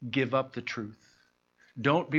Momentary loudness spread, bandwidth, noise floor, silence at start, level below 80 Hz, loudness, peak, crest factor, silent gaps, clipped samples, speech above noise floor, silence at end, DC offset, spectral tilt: 15 LU; 7.4 kHz; -68 dBFS; 0 s; -74 dBFS; -31 LUFS; -10 dBFS; 20 dB; none; under 0.1%; 38 dB; 0 s; under 0.1%; -6.5 dB/octave